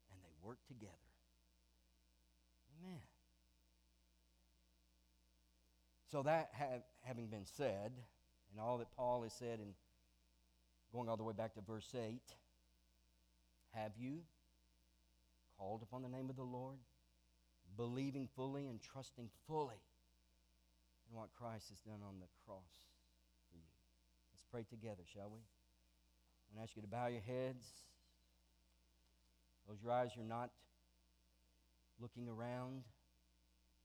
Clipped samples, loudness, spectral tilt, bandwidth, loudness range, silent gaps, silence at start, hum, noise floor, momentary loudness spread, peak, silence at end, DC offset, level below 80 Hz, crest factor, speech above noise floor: under 0.1%; -49 LUFS; -6.5 dB/octave; over 20 kHz; 14 LU; none; 0.1 s; 60 Hz at -75 dBFS; -77 dBFS; 18 LU; -28 dBFS; 0.95 s; under 0.1%; -78 dBFS; 24 dB; 29 dB